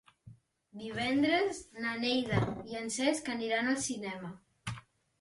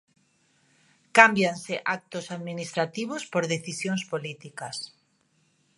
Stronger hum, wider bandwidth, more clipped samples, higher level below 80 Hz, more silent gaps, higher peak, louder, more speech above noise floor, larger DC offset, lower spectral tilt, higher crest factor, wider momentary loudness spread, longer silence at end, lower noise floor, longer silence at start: neither; about the same, 11.5 kHz vs 11.5 kHz; neither; first, -60 dBFS vs -74 dBFS; neither; second, -16 dBFS vs 0 dBFS; second, -33 LUFS vs -26 LUFS; second, 25 dB vs 42 dB; neither; about the same, -4 dB/octave vs -4 dB/octave; second, 20 dB vs 28 dB; second, 15 LU vs 18 LU; second, 0.4 s vs 0.9 s; second, -58 dBFS vs -68 dBFS; second, 0.25 s vs 1.15 s